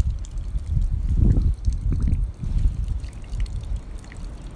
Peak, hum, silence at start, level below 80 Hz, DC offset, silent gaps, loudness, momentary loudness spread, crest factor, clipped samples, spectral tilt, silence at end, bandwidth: -6 dBFS; none; 0 s; -24 dBFS; under 0.1%; none; -26 LUFS; 13 LU; 16 dB; under 0.1%; -8 dB/octave; 0 s; 9.8 kHz